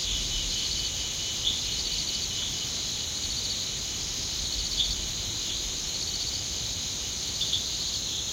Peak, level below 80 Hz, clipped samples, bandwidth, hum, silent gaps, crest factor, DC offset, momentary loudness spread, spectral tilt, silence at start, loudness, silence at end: -12 dBFS; -44 dBFS; under 0.1%; 16 kHz; none; none; 18 dB; under 0.1%; 3 LU; -0.5 dB/octave; 0 s; -28 LUFS; 0 s